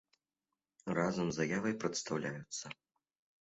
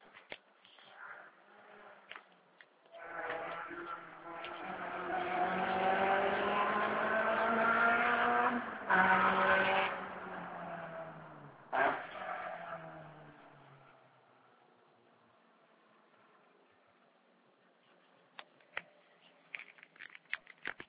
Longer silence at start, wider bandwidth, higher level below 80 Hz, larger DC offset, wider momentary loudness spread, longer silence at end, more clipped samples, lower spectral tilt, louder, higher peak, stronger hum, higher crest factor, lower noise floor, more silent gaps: first, 0.85 s vs 0.15 s; first, 8.2 kHz vs 4 kHz; about the same, -72 dBFS vs -72 dBFS; neither; second, 13 LU vs 24 LU; first, 0.7 s vs 0.05 s; neither; first, -4.5 dB/octave vs -2 dB/octave; second, -37 LUFS vs -34 LUFS; second, -20 dBFS vs -16 dBFS; neither; about the same, 20 dB vs 22 dB; first, under -90 dBFS vs -69 dBFS; neither